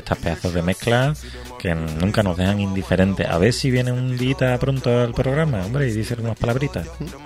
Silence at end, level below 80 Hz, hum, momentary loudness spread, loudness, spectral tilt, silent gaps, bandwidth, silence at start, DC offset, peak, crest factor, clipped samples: 0 s; -36 dBFS; none; 7 LU; -21 LUFS; -6.5 dB/octave; none; 15 kHz; 0 s; under 0.1%; -2 dBFS; 18 dB; under 0.1%